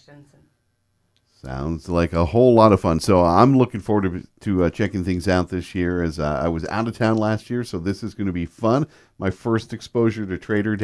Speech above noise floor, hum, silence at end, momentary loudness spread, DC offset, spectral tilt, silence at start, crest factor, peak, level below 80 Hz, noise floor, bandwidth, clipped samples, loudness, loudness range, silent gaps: 48 dB; none; 0 s; 13 LU; under 0.1%; -7.5 dB/octave; 1.45 s; 20 dB; 0 dBFS; -42 dBFS; -68 dBFS; 11 kHz; under 0.1%; -21 LUFS; 6 LU; none